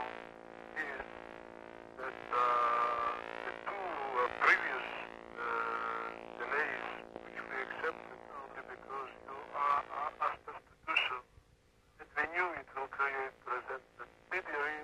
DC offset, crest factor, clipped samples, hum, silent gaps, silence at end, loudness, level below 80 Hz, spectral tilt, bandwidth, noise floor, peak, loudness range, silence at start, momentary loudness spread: under 0.1%; 24 dB; under 0.1%; none; none; 0 s; -36 LUFS; -70 dBFS; -3.5 dB/octave; 13 kHz; -67 dBFS; -16 dBFS; 6 LU; 0 s; 18 LU